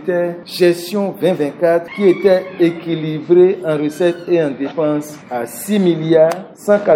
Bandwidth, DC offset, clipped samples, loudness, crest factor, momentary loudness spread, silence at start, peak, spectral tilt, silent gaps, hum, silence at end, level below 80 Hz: 16.5 kHz; under 0.1%; under 0.1%; -16 LUFS; 14 dB; 10 LU; 0 s; 0 dBFS; -6.5 dB/octave; none; none; 0 s; -66 dBFS